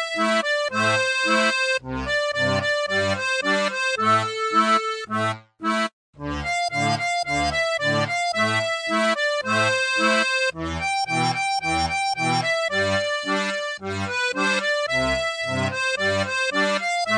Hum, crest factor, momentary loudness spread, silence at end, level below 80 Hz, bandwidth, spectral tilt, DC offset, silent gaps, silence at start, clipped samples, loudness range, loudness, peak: none; 16 dB; 6 LU; 0 s; -48 dBFS; 10.5 kHz; -3.5 dB/octave; under 0.1%; 5.93-6.13 s; 0 s; under 0.1%; 2 LU; -22 LUFS; -8 dBFS